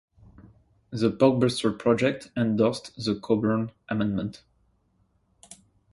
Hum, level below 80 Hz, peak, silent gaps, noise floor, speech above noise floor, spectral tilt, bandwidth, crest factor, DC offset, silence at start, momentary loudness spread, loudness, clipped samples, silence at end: none; -58 dBFS; -6 dBFS; none; -68 dBFS; 43 dB; -6.5 dB/octave; 11.5 kHz; 20 dB; under 0.1%; 0.9 s; 10 LU; -25 LUFS; under 0.1%; 0.4 s